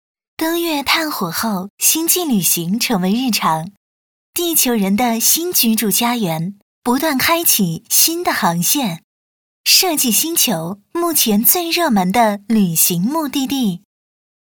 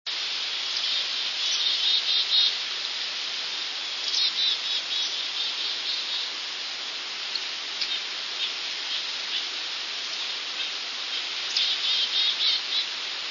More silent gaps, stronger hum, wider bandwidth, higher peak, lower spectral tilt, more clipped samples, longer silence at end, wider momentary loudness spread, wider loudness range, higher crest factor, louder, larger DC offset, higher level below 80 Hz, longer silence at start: first, 1.70-1.78 s, 3.77-4.33 s, 6.62-6.82 s, 9.04-9.64 s vs none; neither; first, over 20 kHz vs 7.4 kHz; first, 0 dBFS vs -10 dBFS; first, -3 dB/octave vs 2.5 dB/octave; neither; first, 0.75 s vs 0 s; about the same, 10 LU vs 8 LU; second, 2 LU vs 5 LU; about the same, 16 dB vs 18 dB; first, -15 LUFS vs -25 LUFS; neither; first, -56 dBFS vs -88 dBFS; first, 0.4 s vs 0.05 s